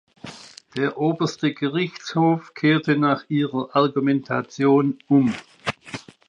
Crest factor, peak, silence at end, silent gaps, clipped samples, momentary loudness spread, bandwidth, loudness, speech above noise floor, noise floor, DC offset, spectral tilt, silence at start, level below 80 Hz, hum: 16 dB; -6 dBFS; 0.3 s; none; under 0.1%; 15 LU; 9.6 kHz; -22 LUFS; 22 dB; -42 dBFS; under 0.1%; -6.5 dB/octave; 0.25 s; -66 dBFS; none